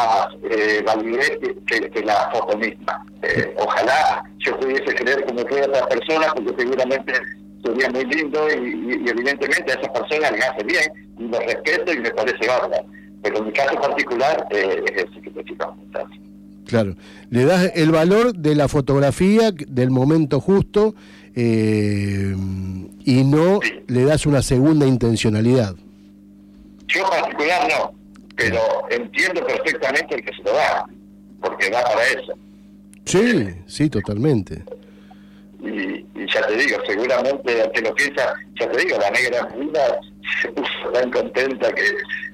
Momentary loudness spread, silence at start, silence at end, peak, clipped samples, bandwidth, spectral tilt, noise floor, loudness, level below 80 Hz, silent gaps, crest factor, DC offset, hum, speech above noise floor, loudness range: 10 LU; 0 s; 0 s; -6 dBFS; under 0.1%; 15.5 kHz; -5.5 dB/octave; -45 dBFS; -19 LUFS; -46 dBFS; none; 14 dB; under 0.1%; 50 Hz at -45 dBFS; 26 dB; 5 LU